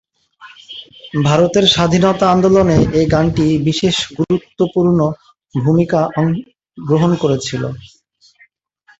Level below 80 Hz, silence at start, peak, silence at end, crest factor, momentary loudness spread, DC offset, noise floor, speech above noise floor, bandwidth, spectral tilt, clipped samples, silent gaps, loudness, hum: -40 dBFS; 0.4 s; 0 dBFS; 1.15 s; 14 dB; 14 LU; under 0.1%; -53 dBFS; 39 dB; 8 kHz; -6 dB/octave; under 0.1%; none; -14 LUFS; none